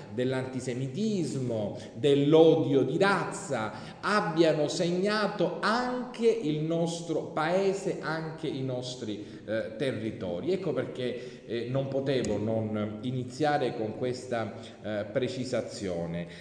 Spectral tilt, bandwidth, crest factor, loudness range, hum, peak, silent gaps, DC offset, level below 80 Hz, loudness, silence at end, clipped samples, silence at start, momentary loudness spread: -6 dB/octave; 10 kHz; 20 dB; 7 LU; none; -8 dBFS; none; under 0.1%; -64 dBFS; -29 LUFS; 0 s; under 0.1%; 0 s; 10 LU